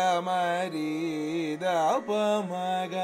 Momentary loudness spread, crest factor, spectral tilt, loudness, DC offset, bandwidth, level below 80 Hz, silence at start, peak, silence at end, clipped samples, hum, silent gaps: 5 LU; 14 dB; -5 dB/octave; -28 LUFS; under 0.1%; 16 kHz; -82 dBFS; 0 s; -14 dBFS; 0 s; under 0.1%; none; none